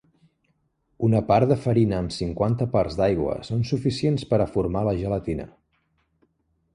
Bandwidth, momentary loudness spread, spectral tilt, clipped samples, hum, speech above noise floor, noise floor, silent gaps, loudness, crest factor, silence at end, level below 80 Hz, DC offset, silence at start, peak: 10.5 kHz; 8 LU; -8 dB/octave; under 0.1%; none; 47 dB; -70 dBFS; none; -24 LUFS; 18 dB; 1.3 s; -44 dBFS; under 0.1%; 1 s; -6 dBFS